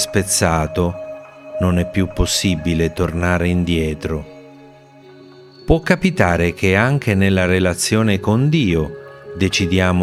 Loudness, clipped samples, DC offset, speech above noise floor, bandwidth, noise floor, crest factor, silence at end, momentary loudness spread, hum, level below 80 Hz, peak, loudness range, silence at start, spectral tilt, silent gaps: -17 LUFS; under 0.1%; under 0.1%; 27 dB; 15.5 kHz; -43 dBFS; 18 dB; 0 s; 12 LU; none; -34 dBFS; 0 dBFS; 4 LU; 0 s; -5 dB/octave; none